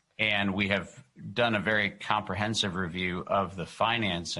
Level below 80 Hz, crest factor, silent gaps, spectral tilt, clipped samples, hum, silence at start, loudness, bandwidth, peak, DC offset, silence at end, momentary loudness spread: -54 dBFS; 20 dB; none; -4.5 dB/octave; under 0.1%; none; 0.2 s; -28 LUFS; 11.5 kHz; -10 dBFS; under 0.1%; 0 s; 6 LU